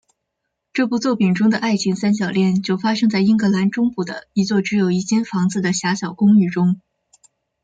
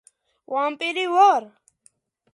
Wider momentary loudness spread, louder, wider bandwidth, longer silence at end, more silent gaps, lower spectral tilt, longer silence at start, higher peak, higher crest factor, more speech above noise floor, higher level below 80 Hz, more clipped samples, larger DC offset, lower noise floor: about the same, 7 LU vs 9 LU; first, -18 LUFS vs -21 LUFS; second, 9 kHz vs 11.5 kHz; about the same, 0.85 s vs 0.85 s; neither; first, -6 dB/octave vs -2 dB/octave; first, 0.75 s vs 0.5 s; about the same, -6 dBFS vs -4 dBFS; second, 12 dB vs 18 dB; first, 60 dB vs 41 dB; first, -60 dBFS vs -84 dBFS; neither; neither; first, -77 dBFS vs -62 dBFS